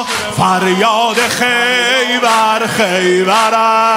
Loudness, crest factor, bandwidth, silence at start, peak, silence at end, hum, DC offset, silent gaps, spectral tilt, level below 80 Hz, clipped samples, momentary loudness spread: -11 LUFS; 12 dB; 16.5 kHz; 0 s; 0 dBFS; 0 s; none; under 0.1%; none; -3 dB/octave; -52 dBFS; under 0.1%; 2 LU